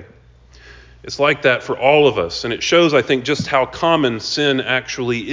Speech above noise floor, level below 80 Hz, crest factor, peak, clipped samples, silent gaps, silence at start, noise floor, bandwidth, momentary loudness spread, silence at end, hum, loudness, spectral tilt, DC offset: 30 dB; -48 dBFS; 16 dB; 0 dBFS; under 0.1%; none; 0 s; -46 dBFS; 7.6 kHz; 8 LU; 0 s; none; -16 LUFS; -4.5 dB/octave; under 0.1%